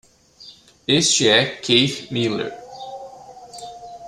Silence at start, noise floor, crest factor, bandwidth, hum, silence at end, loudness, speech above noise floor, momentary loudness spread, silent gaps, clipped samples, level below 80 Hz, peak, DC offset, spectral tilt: 0.4 s; -46 dBFS; 20 dB; 13.5 kHz; none; 0 s; -17 LUFS; 28 dB; 22 LU; none; under 0.1%; -58 dBFS; -2 dBFS; under 0.1%; -3 dB/octave